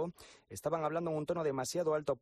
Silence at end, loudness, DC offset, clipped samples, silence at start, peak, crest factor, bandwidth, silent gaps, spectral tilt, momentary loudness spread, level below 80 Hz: 0.05 s; -36 LUFS; under 0.1%; under 0.1%; 0 s; -20 dBFS; 16 dB; 14 kHz; none; -5.5 dB/octave; 8 LU; -68 dBFS